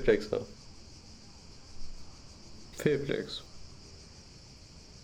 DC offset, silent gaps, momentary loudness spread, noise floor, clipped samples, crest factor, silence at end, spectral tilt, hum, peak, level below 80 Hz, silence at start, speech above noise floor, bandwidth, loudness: under 0.1%; none; 22 LU; -52 dBFS; under 0.1%; 26 dB; 0 s; -5.5 dB/octave; none; -10 dBFS; -50 dBFS; 0 s; 22 dB; 16 kHz; -33 LUFS